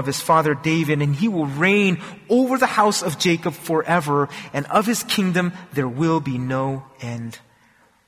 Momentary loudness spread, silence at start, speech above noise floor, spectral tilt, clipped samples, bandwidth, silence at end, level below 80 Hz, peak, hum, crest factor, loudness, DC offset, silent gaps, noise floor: 11 LU; 0 s; 37 dB; -5 dB/octave; under 0.1%; 16 kHz; 0.7 s; -58 dBFS; -4 dBFS; none; 16 dB; -20 LUFS; under 0.1%; none; -57 dBFS